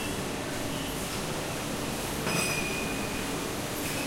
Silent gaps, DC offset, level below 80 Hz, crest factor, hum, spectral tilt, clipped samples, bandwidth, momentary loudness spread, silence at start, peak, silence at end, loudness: none; under 0.1%; -48 dBFS; 16 dB; none; -3.5 dB/octave; under 0.1%; 16 kHz; 5 LU; 0 s; -14 dBFS; 0 s; -31 LUFS